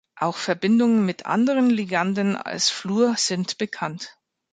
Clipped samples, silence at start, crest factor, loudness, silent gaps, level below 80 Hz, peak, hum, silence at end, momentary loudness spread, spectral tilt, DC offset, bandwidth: under 0.1%; 0.15 s; 16 dB; -22 LUFS; none; -70 dBFS; -6 dBFS; none; 0.4 s; 9 LU; -4 dB/octave; under 0.1%; 9.4 kHz